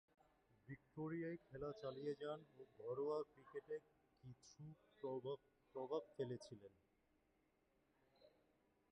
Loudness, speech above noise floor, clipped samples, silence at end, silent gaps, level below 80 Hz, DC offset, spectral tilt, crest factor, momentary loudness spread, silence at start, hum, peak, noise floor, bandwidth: -51 LUFS; 32 dB; under 0.1%; 0.65 s; none; -82 dBFS; under 0.1%; -7 dB/octave; 20 dB; 15 LU; 0.65 s; none; -34 dBFS; -82 dBFS; 8.4 kHz